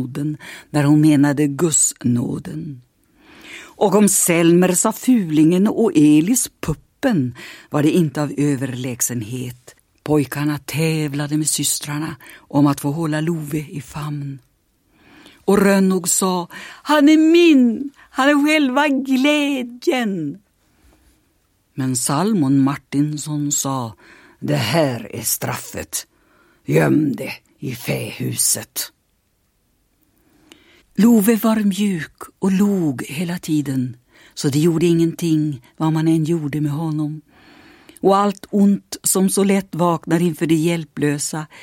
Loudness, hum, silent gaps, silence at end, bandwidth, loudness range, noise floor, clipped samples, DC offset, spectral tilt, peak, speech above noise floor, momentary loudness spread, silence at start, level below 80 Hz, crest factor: -18 LUFS; none; none; 0 s; 16.5 kHz; 7 LU; -64 dBFS; under 0.1%; under 0.1%; -5 dB/octave; 0 dBFS; 47 dB; 14 LU; 0 s; -54 dBFS; 18 dB